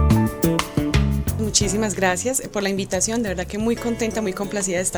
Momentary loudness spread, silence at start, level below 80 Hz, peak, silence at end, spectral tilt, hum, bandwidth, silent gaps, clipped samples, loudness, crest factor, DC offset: 5 LU; 0 s; -30 dBFS; -2 dBFS; 0 s; -4.5 dB/octave; none; over 20 kHz; none; under 0.1%; -21 LUFS; 20 dB; under 0.1%